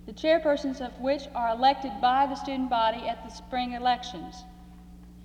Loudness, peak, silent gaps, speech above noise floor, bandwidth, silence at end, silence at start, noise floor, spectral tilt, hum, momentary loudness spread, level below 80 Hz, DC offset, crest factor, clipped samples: -27 LUFS; -12 dBFS; none; 20 dB; 10.5 kHz; 0 s; 0.05 s; -48 dBFS; -5 dB/octave; 60 Hz at -50 dBFS; 13 LU; -50 dBFS; under 0.1%; 16 dB; under 0.1%